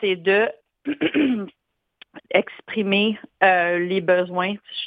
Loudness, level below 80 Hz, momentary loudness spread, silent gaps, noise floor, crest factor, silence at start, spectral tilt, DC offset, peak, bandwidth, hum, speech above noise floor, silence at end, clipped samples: -21 LUFS; -66 dBFS; 10 LU; none; -54 dBFS; 18 dB; 0 s; -8 dB/octave; under 0.1%; -4 dBFS; 5 kHz; none; 33 dB; 0 s; under 0.1%